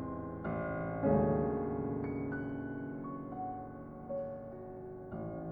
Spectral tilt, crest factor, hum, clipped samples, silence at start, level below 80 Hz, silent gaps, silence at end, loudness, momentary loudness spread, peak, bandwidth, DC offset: -12 dB/octave; 18 dB; none; under 0.1%; 0 s; -54 dBFS; none; 0 s; -38 LUFS; 15 LU; -18 dBFS; 3.6 kHz; under 0.1%